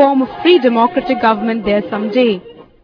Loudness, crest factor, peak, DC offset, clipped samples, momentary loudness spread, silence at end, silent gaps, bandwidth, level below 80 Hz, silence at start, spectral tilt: -14 LUFS; 14 dB; 0 dBFS; under 0.1%; under 0.1%; 6 LU; 0.2 s; none; 5.4 kHz; -48 dBFS; 0 s; -7.5 dB/octave